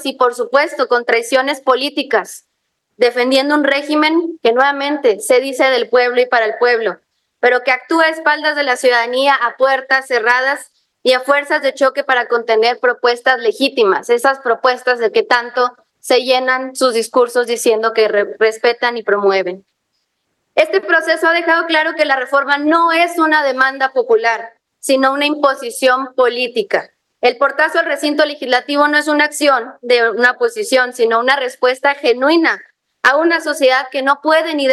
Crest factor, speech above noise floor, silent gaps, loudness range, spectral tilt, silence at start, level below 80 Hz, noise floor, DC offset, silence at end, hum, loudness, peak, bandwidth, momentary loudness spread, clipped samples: 14 dB; 56 dB; none; 2 LU; -2 dB/octave; 0 s; -76 dBFS; -70 dBFS; under 0.1%; 0 s; none; -14 LUFS; 0 dBFS; 12.5 kHz; 4 LU; under 0.1%